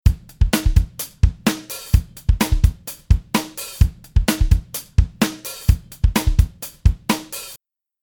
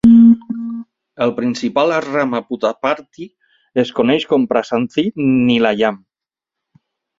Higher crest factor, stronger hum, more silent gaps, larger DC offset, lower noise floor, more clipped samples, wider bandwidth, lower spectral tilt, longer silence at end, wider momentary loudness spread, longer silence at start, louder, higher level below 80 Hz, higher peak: about the same, 18 dB vs 14 dB; neither; neither; neither; second, -48 dBFS vs -86 dBFS; neither; first, 19 kHz vs 7.4 kHz; second, -5 dB/octave vs -6.5 dB/octave; second, 0.45 s vs 1.25 s; second, 6 LU vs 13 LU; about the same, 0.05 s vs 0.05 s; second, -21 LUFS vs -16 LUFS; first, -20 dBFS vs -52 dBFS; about the same, 0 dBFS vs 0 dBFS